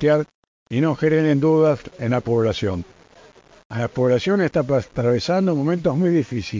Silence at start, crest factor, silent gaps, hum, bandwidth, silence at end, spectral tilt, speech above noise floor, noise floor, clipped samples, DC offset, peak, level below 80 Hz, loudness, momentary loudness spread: 0 s; 14 dB; 0.34-0.66 s, 3.65-3.70 s; none; 7.6 kHz; 0 s; -7.5 dB/octave; 30 dB; -49 dBFS; under 0.1%; under 0.1%; -6 dBFS; -48 dBFS; -20 LUFS; 9 LU